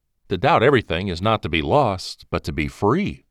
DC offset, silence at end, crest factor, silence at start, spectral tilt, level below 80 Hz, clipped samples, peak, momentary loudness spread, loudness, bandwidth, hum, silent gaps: under 0.1%; 0.15 s; 16 dB; 0.3 s; -6.5 dB/octave; -40 dBFS; under 0.1%; -4 dBFS; 11 LU; -20 LUFS; 13.5 kHz; none; none